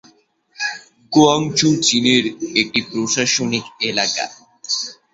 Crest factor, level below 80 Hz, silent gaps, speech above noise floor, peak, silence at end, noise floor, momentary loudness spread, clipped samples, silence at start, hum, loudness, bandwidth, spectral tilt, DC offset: 18 dB; -58 dBFS; none; 38 dB; 0 dBFS; 0.2 s; -55 dBFS; 11 LU; under 0.1%; 0.6 s; none; -17 LUFS; 8 kHz; -3 dB/octave; under 0.1%